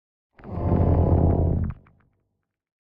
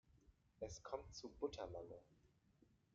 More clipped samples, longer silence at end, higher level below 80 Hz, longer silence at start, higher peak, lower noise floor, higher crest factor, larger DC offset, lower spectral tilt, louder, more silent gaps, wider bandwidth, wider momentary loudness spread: neither; first, 1.1 s vs 0.2 s; first, -34 dBFS vs -70 dBFS; first, 0.45 s vs 0.05 s; first, -8 dBFS vs -32 dBFS; about the same, -77 dBFS vs -76 dBFS; second, 16 dB vs 22 dB; neither; first, -13.5 dB/octave vs -5 dB/octave; first, -23 LUFS vs -52 LUFS; neither; second, 2.7 kHz vs 7.4 kHz; first, 12 LU vs 9 LU